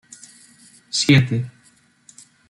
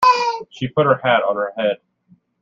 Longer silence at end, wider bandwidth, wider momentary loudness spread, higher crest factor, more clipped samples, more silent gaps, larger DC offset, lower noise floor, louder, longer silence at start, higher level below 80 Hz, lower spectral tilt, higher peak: first, 1 s vs 0.65 s; first, 11.5 kHz vs 9 kHz; first, 20 LU vs 9 LU; about the same, 20 dB vs 16 dB; neither; neither; neither; about the same, -56 dBFS vs -56 dBFS; about the same, -18 LUFS vs -18 LUFS; first, 0.95 s vs 0 s; first, -56 dBFS vs -62 dBFS; about the same, -4.5 dB/octave vs -5.5 dB/octave; about the same, -2 dBFS vs -2 dBFS